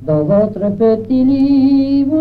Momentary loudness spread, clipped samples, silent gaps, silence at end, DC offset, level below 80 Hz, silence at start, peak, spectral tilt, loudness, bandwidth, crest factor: 3 LU; under 0.1%; none; 0 s; under 0.1%; -42 dBFS; 0 s; -2 dBFS; -10.5 dB/octave; -13 LUFS; 4.9 kHz; 10 dB